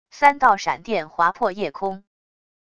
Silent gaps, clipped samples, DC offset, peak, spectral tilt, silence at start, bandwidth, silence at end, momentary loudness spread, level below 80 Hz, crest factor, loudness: none; under 0.1%; 0.5%; 0 dBFS; -4 dB/octave; 0.15 s; 11 kHz; 0.75 s; 13 LU; -60 dBFS; 22 dB; -21 LUFS